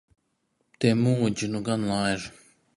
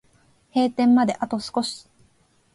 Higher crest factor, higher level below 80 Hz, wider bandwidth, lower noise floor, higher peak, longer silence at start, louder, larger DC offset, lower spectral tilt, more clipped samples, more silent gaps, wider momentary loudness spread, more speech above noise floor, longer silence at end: about the same, 18 dB vs 14 dB; first, -58 dBFS vs -64 dBFS; about the same, 11.5 kHz vs 11.5 kHz; first, -74 dBFS vs -62 dBFS; about the same, -8 dBFS vs -10 dBFS; first, 0.8 s vs 0.55 s; second, -26 LUFS vs -22 LUFS; neither; about the same, -6 dB/octave vs -5 dB/octave; neither; neither; second, 8 LU vs 11 LU; first, 49 dB vs 40 dB; second, 0.45 s vs 0.75 s